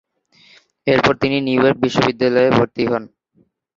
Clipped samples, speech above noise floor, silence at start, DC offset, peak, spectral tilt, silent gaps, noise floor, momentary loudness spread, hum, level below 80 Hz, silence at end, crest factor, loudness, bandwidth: under 0.1%; 44 dB; 0.85 s; under 0.1%; 0 dBFS; -6 dB/octave; none; -60 dBFS; 6 LU; none; -50 dBFS; 0.7 s; 16 dB; -16 LUFS; 7.6 kHz